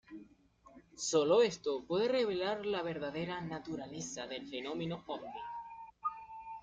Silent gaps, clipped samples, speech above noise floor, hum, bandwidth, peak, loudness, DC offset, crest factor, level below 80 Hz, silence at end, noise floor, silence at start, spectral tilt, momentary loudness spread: none; under 0.1%; 28 dB; none; 9.4 kHz; -18 dBFS; -36 LUFS; under 0.1%; 18 dB; -70 dBFS; 0 s; -63 dBFS; 0.1 s; -4 dB/octave; 17 LU